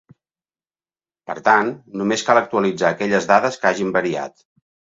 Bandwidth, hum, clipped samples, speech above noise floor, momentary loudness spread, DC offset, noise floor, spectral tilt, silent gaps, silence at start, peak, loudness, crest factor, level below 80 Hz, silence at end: 7.8 kHz; none; under 0.1%; over 72 dB; 9 LU; under 0.1%; under -90 dBFS; -4.5 dB/octave; none; 1.3 s; 0 dBFS; -18 LUFS; 20 dB; -64 dBFS; 0.7 s